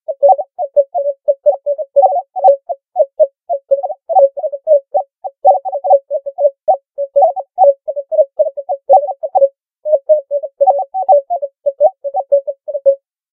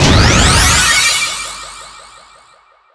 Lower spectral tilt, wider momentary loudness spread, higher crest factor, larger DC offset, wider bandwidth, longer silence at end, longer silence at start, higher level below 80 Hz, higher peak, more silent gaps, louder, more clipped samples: first, -7 dB/octave vs -2.5 dB/octave; second, 9 LU vs 20 LU; about the same, 14 dB vs 12 dB; neither; second, 1.3 kHz vs 11 kHz; second, 0.35 s vs 1.05 s; about the same, 0.1 s vs 0 s; second, -78 dBFS vs -22 dBFS; about the same, 0 dBFS vs 0 dBFS; neither; second, -14 LUFS vs -9 LUFS; neither